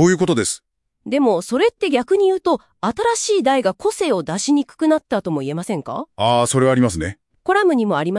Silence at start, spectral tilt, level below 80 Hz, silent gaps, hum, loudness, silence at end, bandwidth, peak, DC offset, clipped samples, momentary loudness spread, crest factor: 0 s; -5 dB/octave; -52 dBFS; none; none; -18 LUFS; 0 s; 12 kHz; -2 dBFS; under 0.1%; under 0.1%; 9 LU; 16 dB